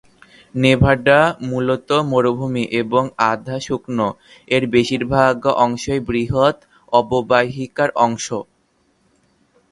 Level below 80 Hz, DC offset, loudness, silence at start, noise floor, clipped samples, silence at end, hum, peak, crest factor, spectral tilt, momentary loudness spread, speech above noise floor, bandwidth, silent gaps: -42 dBFS; under 0.1%; -17 LUFS; 0.55 s; -62 dBFS; under 0.1%; 1.3 s; none; 0 dBFS; 18 dB; -5.5 dB/octave; 10 LU; 45 dB; 11.5 kHz; none